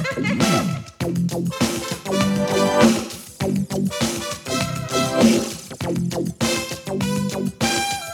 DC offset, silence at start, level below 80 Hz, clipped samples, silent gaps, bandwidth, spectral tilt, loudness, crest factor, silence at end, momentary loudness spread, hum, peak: under 0.1%; 0 s; -46 dBFS; under 0.1%; none; 19 kHz; -4.5 dB/octave; -21 LUFS; 20 dB; 0 s; 10 LU; none; -2 dBFS